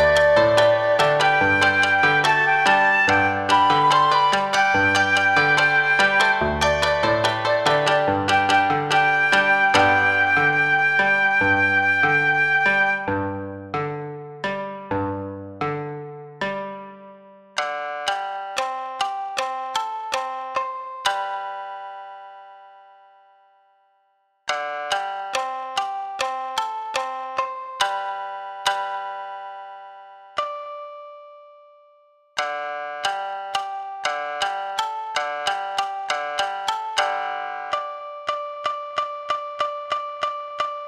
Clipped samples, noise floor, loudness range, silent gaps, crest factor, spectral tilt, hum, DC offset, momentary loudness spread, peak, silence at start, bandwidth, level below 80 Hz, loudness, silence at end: under 0.1%; -66 dBFS; 13 LU; none; 20 dB; -3.5 dB/octave; none; under 0.1%; 15 LU; -2 dBFS; 0 s; 14.5 kHz; -52 dBFS; -20 LUFS; 0 s